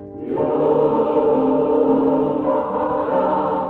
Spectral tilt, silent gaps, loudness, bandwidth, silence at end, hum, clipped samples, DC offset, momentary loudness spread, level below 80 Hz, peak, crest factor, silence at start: -10 dB/octave; none; -18 LUFS; 4.3 kHz; 0 s; none; under 0.1%; under 0.1%; 4 LU; -50 dBFS; -6 dBFS; 12 dB; 0 s